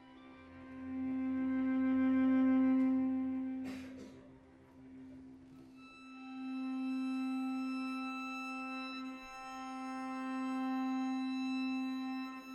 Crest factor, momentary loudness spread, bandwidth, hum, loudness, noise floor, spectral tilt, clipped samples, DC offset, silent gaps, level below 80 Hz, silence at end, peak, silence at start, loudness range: 12 dB; 23 LU; 8.4 kHz; none; -37 LUFS; -59 dBFS; -5.5 dB/octave; under 0.1%; under 0.1%; none; -72 dBFS; 0 s; -24 dBFS; 0 s; 11 LU